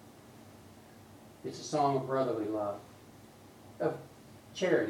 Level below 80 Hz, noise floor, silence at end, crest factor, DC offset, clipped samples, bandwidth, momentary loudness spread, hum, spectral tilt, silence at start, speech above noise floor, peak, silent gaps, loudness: -72 dBFS; -55 dBFS; 0 s; 22 dB; under 0.1%; under 0.1%; 18 kHz; 24 LU; none; -5.5 dB/octave; 0 s; 23 dB; -14 dBFS; none; -34 LUFS